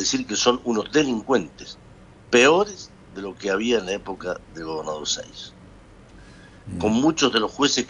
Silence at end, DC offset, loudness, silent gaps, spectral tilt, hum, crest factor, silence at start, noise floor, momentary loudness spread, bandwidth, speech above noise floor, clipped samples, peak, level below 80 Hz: 0 s; under 0.1%; -22 LUFS; none; -3 dB/octave; none; 20 dB; 0 s; -47 dBFS; 20 LU; 10.5 kHz; 25 dB; under 0.1%; -4 dBFS; -52 dBFS